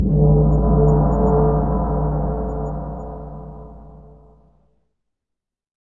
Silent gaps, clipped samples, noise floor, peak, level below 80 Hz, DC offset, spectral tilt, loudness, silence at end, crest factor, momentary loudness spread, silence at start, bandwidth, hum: none; under 0.1%; -83 dBFS; -2 dBFS; -24 dBFS; 0.2%; -13 dB/octave; -18 LUFS; 1.8 s; 16 dB; 19 LU; 0 s; 1.9 kHz; none